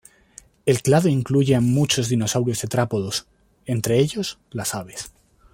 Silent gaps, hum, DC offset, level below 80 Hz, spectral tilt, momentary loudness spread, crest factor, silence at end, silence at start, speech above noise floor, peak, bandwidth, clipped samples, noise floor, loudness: none; none; under 0.1%; -52 dBFS; -5 dB/octave; 12 LU; 18 dB; 0.45 s; 0.65 s; 29 dB; -4 dBFS; 16.5 kHz; under 0.1%; -50 dBFS; -21 LUFS